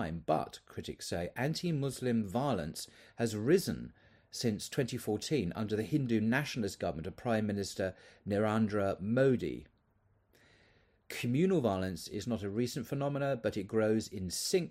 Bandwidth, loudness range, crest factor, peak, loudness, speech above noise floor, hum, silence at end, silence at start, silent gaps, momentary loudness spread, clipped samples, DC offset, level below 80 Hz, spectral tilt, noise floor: 16 kHz; 2 LU; 18 dB; -16 dBFS; -34 LUFS; 38 dB; none; 0 s; 0 s; none; 11 LU; under 0.1%; under 0.1%; -64 dBFS; -5.5 dB/octave; -72 dBFS